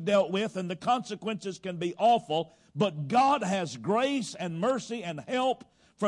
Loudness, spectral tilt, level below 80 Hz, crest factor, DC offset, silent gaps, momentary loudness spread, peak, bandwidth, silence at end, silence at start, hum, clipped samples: -29 LUFS; -5 dB/octave; -72 dBFS; 16 dB; under 0.1%; none; 10 LU; -14 dBFS; 11.5 kHz; 0 s; 0 s; none; under 0.1%